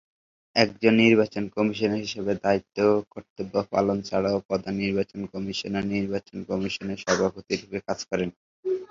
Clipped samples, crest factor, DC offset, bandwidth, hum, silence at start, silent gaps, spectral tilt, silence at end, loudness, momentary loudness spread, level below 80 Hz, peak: under 0.1%; 22 dB; under 0.1%; 7.6 kHz; none; 0.55 s; 3.30-3.36 s, 4.45-4.49 s, 8.36-8.63 s; -5.5 dB/octave; 0.05 s; -26 LUFS; 11 LU; -56 dBFS; -4 dBFS